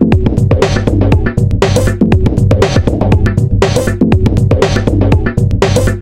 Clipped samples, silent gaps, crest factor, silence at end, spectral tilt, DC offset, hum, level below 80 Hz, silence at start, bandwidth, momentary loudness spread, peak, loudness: 0.7%; none; 10 dB; 0 s; -7 dB/octave; under 0.1%; none; -18 dBFS; 0 s; 14 kHz; 2 LU; 0 dBFS; -11 LUFS